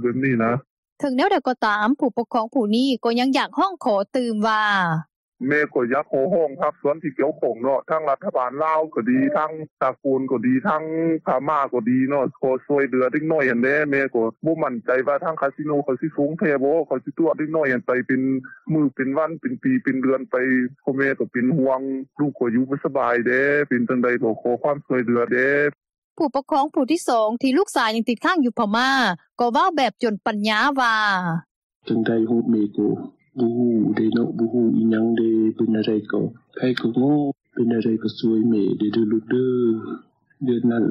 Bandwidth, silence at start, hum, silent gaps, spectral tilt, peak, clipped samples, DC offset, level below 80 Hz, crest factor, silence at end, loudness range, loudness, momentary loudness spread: 12.5 kHz; 0 s; none; 0.70-0.83 s, 0.92-0.96 s, 5.16-5.32 s, 9.71-9.77 s, 25.98-26.16 s, 31.51-31.70 s, 31.76-31.80 s; -6.5 dB/octave; -6 dBFS; under 0.1%; under 0.1%; -68 dBFS; 14 dB; 0 s; 2 LU; -21 LUFS; 6 LU